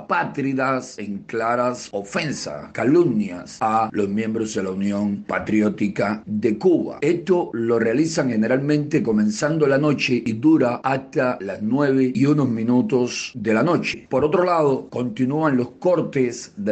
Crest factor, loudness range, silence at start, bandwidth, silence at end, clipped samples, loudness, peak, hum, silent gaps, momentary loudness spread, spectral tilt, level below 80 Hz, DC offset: 14 dB; 3 LU; 0 s; 8.8 kHz; 0 s; under 0.1%; -21 LUFS; -6 dBFS; none; none; 7 LU; -6 dB/octave; -58 dBFS; under 0.1%